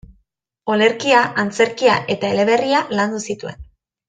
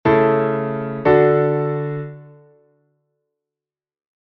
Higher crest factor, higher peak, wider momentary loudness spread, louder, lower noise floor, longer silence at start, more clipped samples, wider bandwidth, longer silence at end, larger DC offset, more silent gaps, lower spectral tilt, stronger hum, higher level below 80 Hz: about the same, 16 dB vs 18 dB; about the same, -2 dBFS vs -2 dBFS; about the same, 12 LU vs 13 LU; about the same, -17 LUFS vs -18 LUFS; second, -65 dBFS vs under -90 dBFS; first, 0.65 s vs 0.05 s; neither; first, 9.4 kHz vs 5.4 kHz; second, 0.45 s vs 1.95 s; neither; neither; second, -4 dB/octave vs -10.5 dB/octave; neither; about the same, -50 dBFS vs -52 dBFS